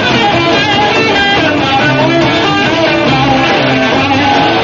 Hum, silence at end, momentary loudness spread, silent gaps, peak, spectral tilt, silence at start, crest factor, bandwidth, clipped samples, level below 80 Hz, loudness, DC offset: none; 0 s; 1 LU; none; 0 dBFS; -5 dB/octave; 0 s; 10 dB; 7.6 kHz; under 0.1%; -36 dBFS; -9 LUFS; under 0.1%